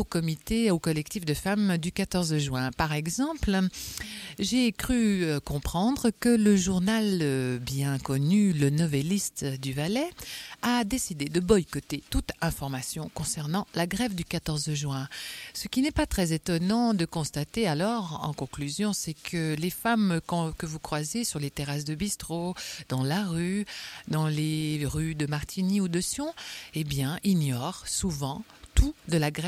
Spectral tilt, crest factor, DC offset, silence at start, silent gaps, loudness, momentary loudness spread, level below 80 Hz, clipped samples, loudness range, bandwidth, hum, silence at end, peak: -5 dB/octave; 22 dB; under 0.1%; 0 s; none; -28 LUFS; 9 LU; -42 dBFS; under 0.1%; 5 LU; 16 kHz; none; 0 s; -6 dBFS